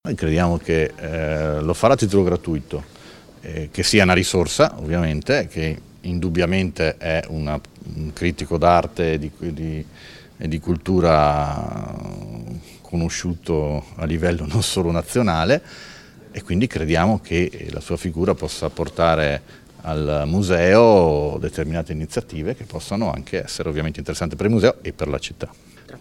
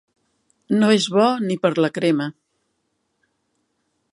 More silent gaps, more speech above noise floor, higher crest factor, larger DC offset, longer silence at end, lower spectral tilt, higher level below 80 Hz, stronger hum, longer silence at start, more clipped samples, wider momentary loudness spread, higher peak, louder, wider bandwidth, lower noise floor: neither; second, 23 dB vs 54 dB; about the same, 20 dB vs 18 dB; neither; second, 0 s vs 1.8 s; about the same, -5.5 dB/octave vs -5.5 dB/octave; first, -36 dBFS vs -70 dBFS; neither; second, 0.05 s vs 0.7 s; neither; first, 15 LU vs 7 LU; first, 0 dBFS vs -4 dBFS; about the same, -20 LUFS vs -19 LUFS; first, 15 kHz vs 11.5 kHz; second, -43 dBFS vs -72 dBFS